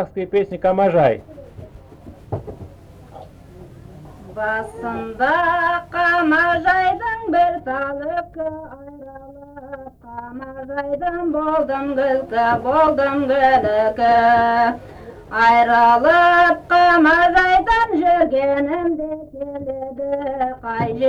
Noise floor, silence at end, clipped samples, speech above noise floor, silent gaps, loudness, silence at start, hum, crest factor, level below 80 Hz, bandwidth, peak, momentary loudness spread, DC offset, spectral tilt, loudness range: -41 dBFS; 0 s; under 0.1%; 24 dB; none; -17 LUFS; 0 s; none; 16 dB; -44 dBFS; 9.6 kHz; -2 dBFS; 20 LU; under 0.1%; -6.5 dB/octave; 15 LU